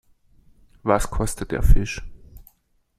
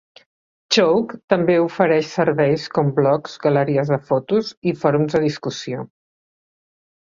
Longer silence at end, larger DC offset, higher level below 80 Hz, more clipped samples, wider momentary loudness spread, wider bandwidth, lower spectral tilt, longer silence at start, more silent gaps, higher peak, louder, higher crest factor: second, 0.6 s vs 1.2 s; neither; first, -24 dBFS vs -60 dBFS; neither; about the same, 11 LU vs 9 LU; first, 14 kHz vs 7.6 kHz; about the same, -5.5 dB/octave vs -6 dB/octave; first, 0.85 s vs 0.7 s; second, none vs 1.24-1.28 s, 4.57-4.62 s; about the same, -2 dBFS vs -2 dBFS; second, -24 LUFS vs -19 LUFS; about the same, 20 dB vs 18 dB